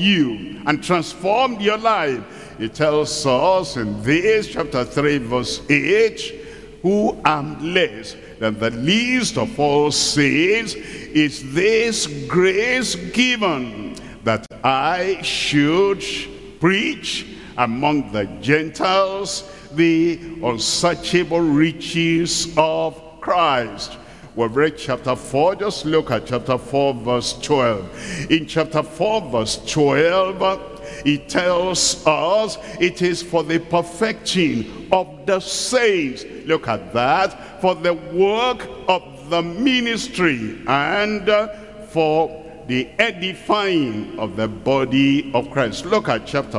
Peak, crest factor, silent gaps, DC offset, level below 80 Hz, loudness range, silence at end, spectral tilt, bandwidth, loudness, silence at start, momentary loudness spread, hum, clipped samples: 0 dBFS; 20 dB; none; 0.2%; -46 dBFS; 2 LU; 0 s; -4 dB/octave; 12 kHz; -19 LUFS; 0 s; 9 LU; none; under 0.1%